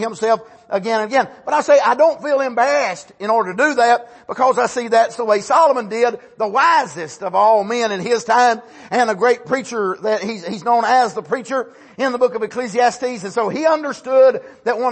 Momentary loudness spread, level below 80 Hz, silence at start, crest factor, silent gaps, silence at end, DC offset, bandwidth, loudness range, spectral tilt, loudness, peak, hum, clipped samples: 10 LU; -68 dBFS; 0 s; 14 dB; none; 0 s; under 0.1%; 8.8 kHz; 3 LU; -3.5 dB/octave; -17 LUFS; -2 dBFS; none; under 0.1%